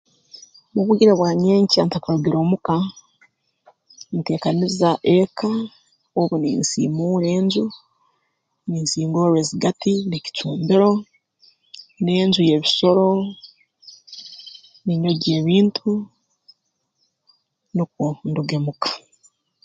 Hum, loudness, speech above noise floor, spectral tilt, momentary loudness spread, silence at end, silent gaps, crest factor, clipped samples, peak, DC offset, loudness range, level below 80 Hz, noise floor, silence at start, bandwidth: none; -19 LUFS; 53 dB; -6 dB/octave; 13 LU; 0.65 s; none; 18 dB; under 0.1%; -2 dBFS; under 0.1%; 4 LU; -60 dBFS; -72 dBFS; 0.75 s; 9.4 kHz